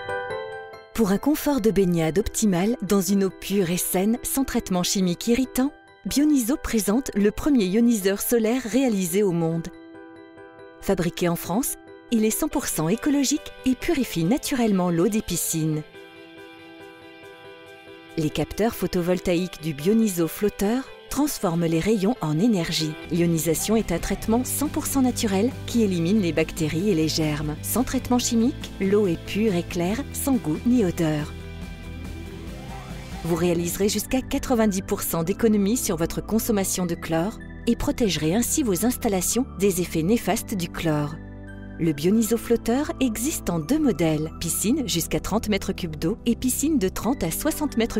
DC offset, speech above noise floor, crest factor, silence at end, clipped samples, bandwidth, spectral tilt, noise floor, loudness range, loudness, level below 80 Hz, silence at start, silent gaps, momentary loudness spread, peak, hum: under 0.1%; 22 dB; 16 dB; 0 s; under 0.1%; 16 kHz; -5 dB/octave; -44 dBFS; 4 LU; -23 LUFS; -42 dBFS; 0 s; none; 14 LU; -8 dBFS; none